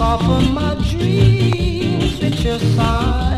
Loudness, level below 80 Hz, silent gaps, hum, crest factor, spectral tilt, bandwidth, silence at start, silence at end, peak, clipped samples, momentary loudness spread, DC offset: -16 LUFS; -22 dBFS; none; none; 14 dB; -7 dB/octave; 12.5 kHz; 0 s; 0 s; -2 dBFS; under 0.1%; 5 LU; under 0.1%